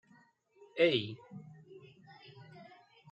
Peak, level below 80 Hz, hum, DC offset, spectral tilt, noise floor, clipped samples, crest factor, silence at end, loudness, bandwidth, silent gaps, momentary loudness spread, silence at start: -16 dBFS; -84 dBFS; none; under 0.1%; -6.5 dB/octave; -66 dBFS; under 0.1%; 22 dB; 0.5 s; -32 LUFS; 8.2 kHz; none; 27 LU; 0.75 s